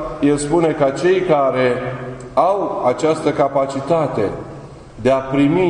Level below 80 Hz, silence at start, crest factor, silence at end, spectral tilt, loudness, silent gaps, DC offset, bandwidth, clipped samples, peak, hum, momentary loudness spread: -44 dBFS; 0 s; 16 dB; 0 s; -6.5 dB/octave; -17 LUFS; none; under 0.1%; 10.5 kHz; under 0.1%; -2 dBFS; none; 11 LU